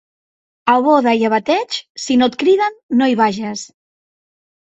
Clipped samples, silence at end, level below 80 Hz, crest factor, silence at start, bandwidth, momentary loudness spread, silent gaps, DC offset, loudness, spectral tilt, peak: under 0.1%; 1.1 s; -60 dBFS; 16 dB; 0.65 s; 8.2 kHz; 11 LU; 1.89-1.95 s, 2.83-2.89 s; under 0.1%; -16 LUFS; -4 dB/octave; 0 dBFS